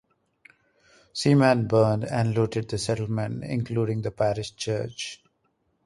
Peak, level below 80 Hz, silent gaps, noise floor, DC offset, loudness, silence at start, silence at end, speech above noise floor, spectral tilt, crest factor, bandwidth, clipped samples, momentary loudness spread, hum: -8 dBFS; -56 dBFS; none; -72 dBFS; under 0.1%; -25 LUFS; 1.15 s; 0.7 s; 47 dB; -6 dB/octave; 18 dB; 11.5 kHz; under 0.1%; 11 LU; none